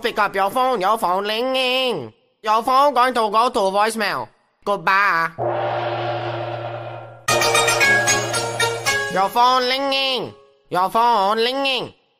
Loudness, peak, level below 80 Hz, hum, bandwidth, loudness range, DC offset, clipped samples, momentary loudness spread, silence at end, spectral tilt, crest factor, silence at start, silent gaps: -18 LUFS; -4 dBFS; -58 dBFS; none; 15.5 kHz; 3 LU; under 0.1%; under 0.1%; 12 LU; 0.3 s; -2.5 dB/octave; 16 dB; 0 s; none